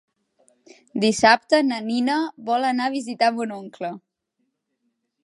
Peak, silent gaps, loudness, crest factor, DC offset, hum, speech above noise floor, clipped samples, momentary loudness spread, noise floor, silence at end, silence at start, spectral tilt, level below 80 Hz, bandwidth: -2 dBFS; none; -21 LUFS; 22 dB; under 0.1%; none; 54 dB; under 0.1%; 16 LU; -75 dBFS; 1.25 s; 0.95 s; -3.5 dB/octave; -66 dBFS; 11.5 kHz